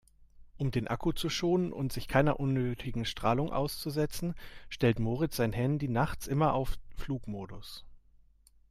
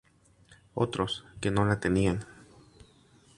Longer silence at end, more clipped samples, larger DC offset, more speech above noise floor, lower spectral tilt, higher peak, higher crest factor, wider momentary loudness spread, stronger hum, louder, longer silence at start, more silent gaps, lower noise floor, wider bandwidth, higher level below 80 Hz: second, 0.7 s vs 1.05 s; neither; neither; about the same, 31 dB vs 33 dB; about the same, -6 dB/octave vs -6 dB/octave; second, -14 dBFS vs -10 dBFS; about the same, 18 dB vs 22 dB; about the same, 13 LU vs 11 LU; neither; second, -32 LUFS vs -29 LUFS; second, 0.2 s vs 0.5 s; neither; about the same, -62 dBFS vs -61 dBFS; first, 16 kHz vs 11.5 kHz; about the same, -46 dBFS vs -50 dBFS